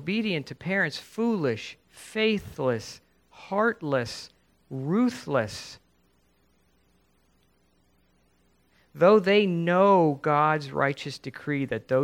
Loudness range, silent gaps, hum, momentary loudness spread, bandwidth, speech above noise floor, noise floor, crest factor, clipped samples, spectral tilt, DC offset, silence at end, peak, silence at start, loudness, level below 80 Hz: 9 LU; none; none; 16 LU; 16.5 kHz; 41 dB; -67 dBFS; 20 dB; under 0.1%; -6 dB/octave; under 0.1%; 0 s; -6 dBFS; 0 s; -25 LUFS; -64 dBFS